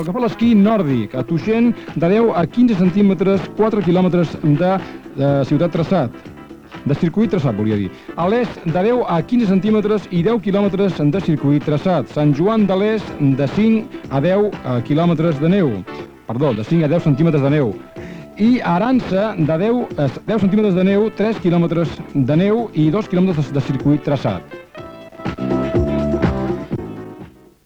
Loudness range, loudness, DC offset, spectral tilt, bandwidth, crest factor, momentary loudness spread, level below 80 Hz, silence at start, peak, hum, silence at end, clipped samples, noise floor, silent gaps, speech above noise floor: 4 LU; -17 LUFS; under 0.1%; -9 dB/octave; 8 kHz; 12 dB; 10 LU; -40 dBFS; 0 s; -4 dBFS; none; 0.35 s; under 0.1%; -39 dBFS; none; 23 dB